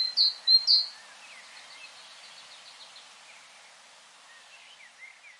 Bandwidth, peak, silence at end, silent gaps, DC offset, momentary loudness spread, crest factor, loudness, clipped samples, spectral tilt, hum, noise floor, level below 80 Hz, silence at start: 11.5 kHz; -10 dBFS; 0.35 s; none; under 0.1%; 29 LU; 22 dB; -21 LUFS; under 0.1%; 3.5 dB/octave; none; -54 dBFS; under -90 dBFS; 0 s